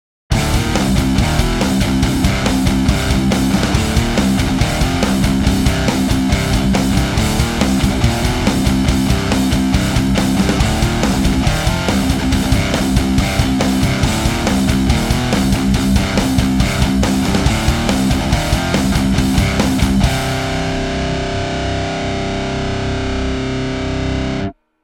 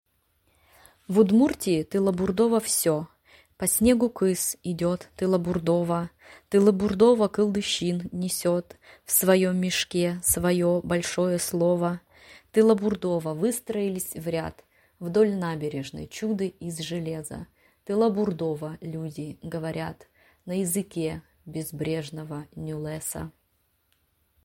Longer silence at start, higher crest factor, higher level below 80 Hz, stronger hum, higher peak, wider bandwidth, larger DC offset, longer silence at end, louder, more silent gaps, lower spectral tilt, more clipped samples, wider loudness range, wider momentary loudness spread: second, 0.3 s vs 1.1 s; about the same, 14 dB vs 18 dB; first, -22 dBFS vs -54 dBFS; neither; first, 0 dBFS vs -8 dBFS; about the same, 18 kHz vs 16.5 kHz; neither; second, 0.3 s vs 1.15 s; first, -16 LUFS vs -25 LUFS; neither; about the same, -5 dB/octave vs -5 dB/octave; neither; second, 3 LU vs 8 LU; second, 5 LU vs 15 LU